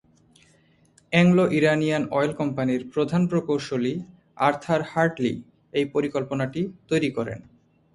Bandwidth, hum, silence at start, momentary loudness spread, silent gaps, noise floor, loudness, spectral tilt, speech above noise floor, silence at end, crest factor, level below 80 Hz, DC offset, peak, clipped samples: 11.5 kHz; none; 1.1 s; 10 LU; none; -60 dBFS; -24 LUFS; -7 dB/octave; 37 dB; 0.55 s; 20 dB; -60 dBFS; under 0.1%; -4 dBFS; under 0.1%